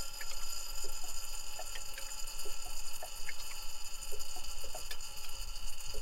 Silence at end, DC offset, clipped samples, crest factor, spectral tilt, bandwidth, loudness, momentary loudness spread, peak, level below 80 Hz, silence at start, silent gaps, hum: 0 s; under 0.1%; under 0.1%; 10 dB; -0.5 dB/octave; 16.5 kHz; -43 LUFS; 3 LU; -22 dBFS; -44 dBFS; 0 s; none; none